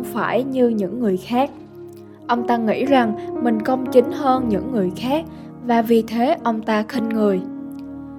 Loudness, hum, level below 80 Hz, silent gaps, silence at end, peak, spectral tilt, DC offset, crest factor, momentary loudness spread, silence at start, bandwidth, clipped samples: -20 LUFS; none; -52 dBFS; none; 0 s; -2 dBFS; -7 dB/octave; under 0.1%; 18 dB; 16 LU; 0 s; 16.5 kHz; under 0.1%